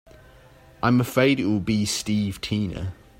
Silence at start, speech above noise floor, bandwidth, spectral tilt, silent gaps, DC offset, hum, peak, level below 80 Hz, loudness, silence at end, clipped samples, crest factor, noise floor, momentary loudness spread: 0.8 s; 28 dB; 16 kHz; -5.5 dB/octave; none; under 0.1%; none; -6 dBFS; -50 dBFS; -23 LUFS; 0.25 s; under 0.1%; 18 dB; -50 dBFS; 7 LU